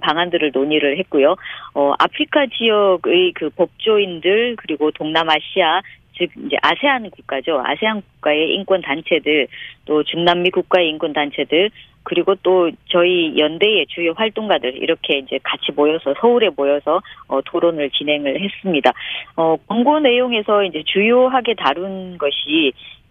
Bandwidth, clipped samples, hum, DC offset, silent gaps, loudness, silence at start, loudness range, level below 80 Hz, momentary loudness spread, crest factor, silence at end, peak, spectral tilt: 6.6 kHz; under 0.1%; none; under 0.1%; none; -17 LUFS; 0 s; 2 LU; -58 dBFS; 7 LU; 16 dB; 0.15 s; 0 dBFS; -6.5 dB/octave